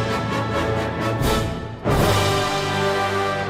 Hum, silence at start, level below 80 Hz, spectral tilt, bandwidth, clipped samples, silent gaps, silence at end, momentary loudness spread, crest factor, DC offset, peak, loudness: none; 0 s; -34 dBFS; -5 dB/octave; 16 kHz; under 0.1%; none; 0 s; 5 LU; 14 dB; under 0.1%; -6 dBFS; -21 LUFS